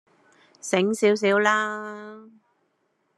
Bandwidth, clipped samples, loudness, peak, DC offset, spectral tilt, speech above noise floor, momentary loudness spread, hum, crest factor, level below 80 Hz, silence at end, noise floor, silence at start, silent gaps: 12.5 kHz; under 0.1%; -22 LUFS; -6 dBFS; under 0.1%; -4 dB/octave; 48 dB; 19 LU; none; 20 dB; -78 dBFS; 0.95 s; -71 dBFS; 0.65 s; none